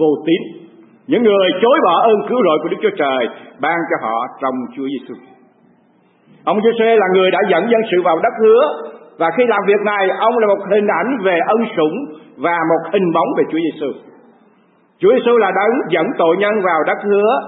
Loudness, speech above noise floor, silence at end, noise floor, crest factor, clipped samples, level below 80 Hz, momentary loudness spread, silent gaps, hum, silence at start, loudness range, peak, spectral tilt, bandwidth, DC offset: -15 LUFS; 39 dB; 0 s; -54 dBFS; 14 dB; under 0.1%; -70 dBFS; 11 LU; none; none; 0 s; 5 LU; -2 dBFS; -11 dB/octave; 4 kHz; under 0.1%